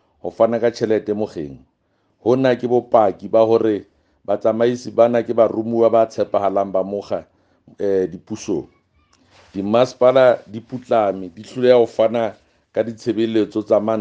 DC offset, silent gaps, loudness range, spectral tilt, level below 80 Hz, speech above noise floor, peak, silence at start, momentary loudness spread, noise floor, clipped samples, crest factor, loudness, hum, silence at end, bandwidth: under 0.1%; none; 4 LU; -6.5 dB/octave; -62 dBFS; 48 dB; 0 dBFS; 0.25 s; 13 LU; -65 dBFS; under 0.1%; 18 dB; -18 LUFS; none; 0 s; 8 kHz